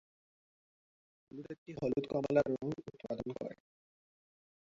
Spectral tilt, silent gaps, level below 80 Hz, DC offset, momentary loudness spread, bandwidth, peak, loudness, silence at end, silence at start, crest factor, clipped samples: -7 dB/octave; 1.58-1.66 s; -68 dBFS; under 0.1%; 18 LU; 7.6 kHz; -16 dBFS; -37 LUFS; 1.1 s; 1.35 s; 24 dB; under 0.1%